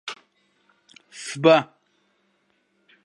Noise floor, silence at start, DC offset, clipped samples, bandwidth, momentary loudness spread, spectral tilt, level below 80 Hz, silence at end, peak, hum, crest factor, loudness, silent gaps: -68 dBFS; 0.05 s; under 0.1%; under 0.1%; 11.5 kHz; 25 LU; -5 dB/octave; -76 dBFS; 1.4 s; -2 dBFS; none; 24 dB; -19 LUFS; none